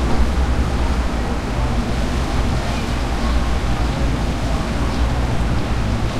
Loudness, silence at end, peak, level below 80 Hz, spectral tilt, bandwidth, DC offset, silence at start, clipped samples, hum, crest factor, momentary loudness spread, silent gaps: -21 LUFS; 0 s; -4 dBFS; -20 dBFS; -6 dB/octave; 12.5 kHz; under 0.1%; 0 s; under 0.1%; none; 14 dB; 2 LU; none